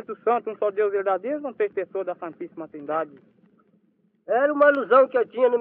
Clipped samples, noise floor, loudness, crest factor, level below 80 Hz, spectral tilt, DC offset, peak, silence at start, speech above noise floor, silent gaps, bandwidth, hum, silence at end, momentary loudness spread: under 0.1%; -65 dBFS; -23 LUFS; 20 dB; -84 dBFS; -3 dB/octave; under 0.1%; -4 dBFS; 0.1 s; 42 dB; none; 4.3 kHz; none; 0 s; 17 LU